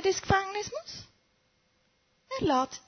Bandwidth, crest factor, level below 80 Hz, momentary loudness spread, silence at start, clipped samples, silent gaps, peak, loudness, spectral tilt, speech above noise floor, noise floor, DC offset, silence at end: 6.6 kHz; 24 dB; -52 dBFS; 15 LU; 0 s; under 0.1%; none; -8 dBFS; -30 LUFS; -4 dB/octave; 41 dB; -71 dBFS; under 0.1%; 0.1 s